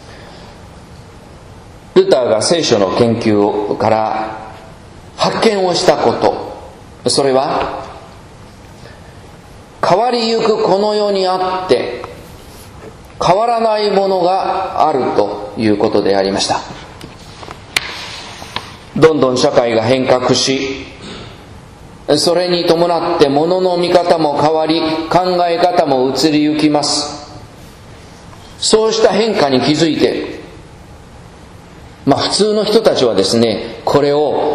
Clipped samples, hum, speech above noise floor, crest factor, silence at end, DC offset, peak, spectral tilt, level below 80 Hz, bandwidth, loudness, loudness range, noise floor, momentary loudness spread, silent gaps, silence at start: 0.1%; none; 24 dB; 14 dB; 0 s; under 0.1%; 0 dBFS; -4.5 dB/octave; -44 dBFS; 14 kHz; -13 LUFS; 4 LU; -37 dBFS; 18 LU; none; 0 s